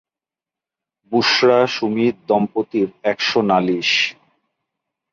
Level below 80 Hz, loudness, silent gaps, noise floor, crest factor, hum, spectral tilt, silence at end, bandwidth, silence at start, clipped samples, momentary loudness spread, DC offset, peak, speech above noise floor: -64 dBFS; -17 LUFS; none; -89 dBFS; 16 dB; none; -4.5 dB/octave; 1 s; 7.4 kHz; 1.1 s; under 0.1%; 7 LU; under 0.1%; -2 dBFS; 72 dB